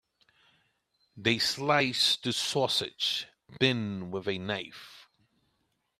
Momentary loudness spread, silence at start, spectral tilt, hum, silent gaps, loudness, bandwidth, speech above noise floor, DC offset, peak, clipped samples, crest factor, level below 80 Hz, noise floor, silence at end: 10 LU; 1.15 s; -3.5 dB/octave; none; none; -28 LUFS; 15.5 kHz; 47 dB; under 0.1%; -8 dBFS; under 0.1%; 24 dB; -70 dBFS; -76 dBFS; 0.95 s